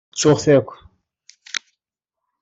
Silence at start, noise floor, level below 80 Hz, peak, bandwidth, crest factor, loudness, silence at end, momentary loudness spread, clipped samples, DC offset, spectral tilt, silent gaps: 0.15 s; -84 dBFS; -56 dBFS; -2 dBFS; 8.2 kHz; 18 dB; -18 LUFS; 0.85 s; 14 LU; under 0.1%; under 0.1%; -5 dB/octave; none